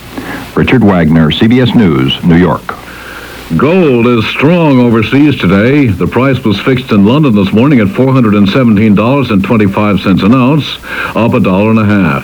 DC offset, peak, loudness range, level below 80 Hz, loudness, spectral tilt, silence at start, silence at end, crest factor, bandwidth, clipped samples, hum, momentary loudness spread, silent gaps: under 0.1%; 0 dBFS; 1 LU; -34 dBFS; -8 LUFS; -8 dB/octave; 0 s; 0 s; 8 dB; over 20 kHz; 2%; none; 9 LU; none